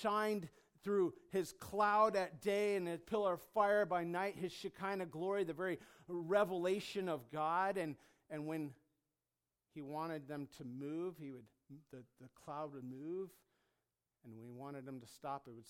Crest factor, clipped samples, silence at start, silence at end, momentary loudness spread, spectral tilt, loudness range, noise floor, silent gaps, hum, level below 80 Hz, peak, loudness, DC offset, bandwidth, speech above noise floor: 20 dB; under 0.1%; 0 s; 0 s; 18 LU; -5.5 dB/octave; 13 LU; under -90 dBFS; none; none; -80 dBFS; -22 dBFS; -40 LUFS; under 0.1%; 17 kHz; over 50 dB